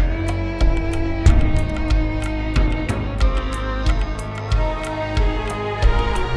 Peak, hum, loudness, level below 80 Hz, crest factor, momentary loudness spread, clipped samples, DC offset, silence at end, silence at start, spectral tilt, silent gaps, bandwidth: -2 dBFS; none; -22 LUFS; -20 dBFS; 16 dB; 5 LU; under 0.1%; under 0.1%; 0 s; 0 s; -6.5 dB/octave; none; 11 kHz